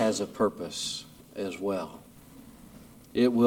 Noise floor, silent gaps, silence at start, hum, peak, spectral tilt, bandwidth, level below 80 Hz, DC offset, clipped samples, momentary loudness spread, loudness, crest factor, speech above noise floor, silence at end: -51 dBFS; none; 0 s; none; -10 dBFS; -4.5 dB/octave; 18.5 kHz; -62 dBFS; under 0.1%; under 0.1%; 23 LU; -31 LUFS; 20 dB; 23 dB; 0 s